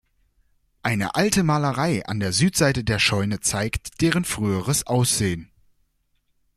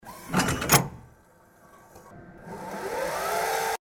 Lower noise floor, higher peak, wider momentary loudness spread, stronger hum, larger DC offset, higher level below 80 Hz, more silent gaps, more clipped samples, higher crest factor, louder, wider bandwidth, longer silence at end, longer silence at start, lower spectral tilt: first, -68 dBFS vs -57 dBFS; about the same, -2 dBFS vs -4 dBFS; second, 6 LU vs 23 LU; neither; neither; about the same, -46 dBFS vs -50 dBFS; neither; neither; about the same, 22 dB vs 24 dB; first, -22 LUFS vs -26 LUFS; about the same, 16 kHz vs 17 kHz; first, 1.15 s vs 0.2 s; first, 0.85 s vs 0.05 s; about the same, -4 dB/octave vs -3.5 dB/octave